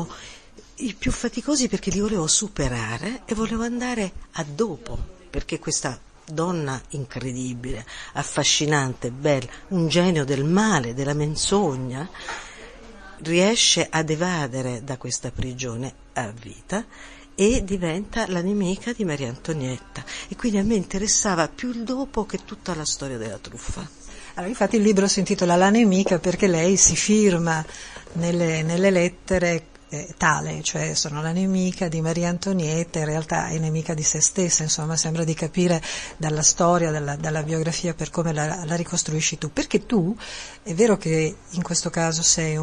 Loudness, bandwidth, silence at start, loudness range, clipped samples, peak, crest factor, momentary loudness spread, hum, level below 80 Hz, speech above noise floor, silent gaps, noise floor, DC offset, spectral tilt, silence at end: -22 LUFS; 10.5 kHz; 0 s; 8 LU; under 0.1%; -4 dBFS; 20 dB; 15 LU; none; -42 dBFS; 22 dB; none; -45 dBFS; under 0.1%; -4 dB/octave; 0 s